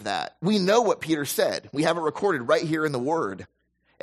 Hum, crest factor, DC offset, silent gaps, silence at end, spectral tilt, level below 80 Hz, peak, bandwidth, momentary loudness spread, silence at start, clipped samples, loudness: none; 18 dB; under 0.1%; none; 0.6 s; -4.5 dB/octave; -68 dBFS; -8 dBFS; 14 kHz; 7 LU; 0 s; under 0.1%; -24 LUFS